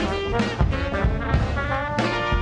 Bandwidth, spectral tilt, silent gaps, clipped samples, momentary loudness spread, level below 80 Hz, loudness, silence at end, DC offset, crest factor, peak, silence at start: 9.8 kHz; -6.5 dB/octave; none; under 0.1%; 2 LU; -28 dBFS; -24 LUFS; 0 s; under 0.1%; 12 dB; -10 dBFS; 0 s